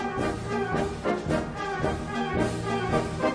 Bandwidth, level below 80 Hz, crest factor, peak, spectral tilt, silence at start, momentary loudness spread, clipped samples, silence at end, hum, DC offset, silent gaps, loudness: 11 kHz; -44 dBFS; 16 dB; -12 dBFS; -6 dB/octave; 0 s; 3 LU; under 0.1%; 0 s; none; under 0.1%; none; -28 LUFS